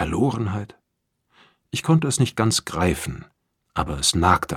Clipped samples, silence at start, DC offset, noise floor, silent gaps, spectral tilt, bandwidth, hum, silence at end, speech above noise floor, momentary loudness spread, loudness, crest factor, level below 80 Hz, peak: under 0.1%; 0 s; under 0.1%; -76 dBFS; none; -4.5 dB/octave; 16 kHz; none; 0 s; 54 dB; 13 LU; -22 LUFS; 22 dB; -40 dBFS; -2 dBFS